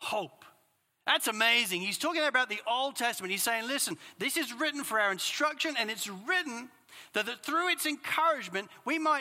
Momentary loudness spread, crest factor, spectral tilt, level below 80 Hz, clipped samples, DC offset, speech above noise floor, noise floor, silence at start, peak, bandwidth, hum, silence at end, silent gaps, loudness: 9 LU; 20 dB; -1 dB/octave; -88 dBFS; under 0.1%; under 0.1%; 41 dB; -72 dBFS; 0 s; -10 dBFS; 16.5 kHz; none; 0 s; none; -30 LUFS